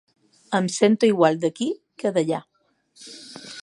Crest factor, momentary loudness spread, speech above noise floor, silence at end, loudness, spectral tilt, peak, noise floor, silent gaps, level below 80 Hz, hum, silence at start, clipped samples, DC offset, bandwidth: 20 dB; 21 LU; 40 dB; 0 s; -22 LUFS; -5 dB/octave; -4 dBFS; -60 dBFS; none; -74 dBFS; none; 0.5 s; under 0.1%; under 0.1%; 11.5 kHz